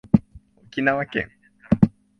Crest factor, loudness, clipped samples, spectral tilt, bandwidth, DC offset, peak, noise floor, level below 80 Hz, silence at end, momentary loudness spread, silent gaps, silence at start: 22 dB; -23 LUFS; under 0.1%; -9 dB/octave; 6.2 kHz; under 0.1%; 0 dBFS; -50 dBFS; -42 dBFS; 0.3 s; 11 LU; none; 0.15 s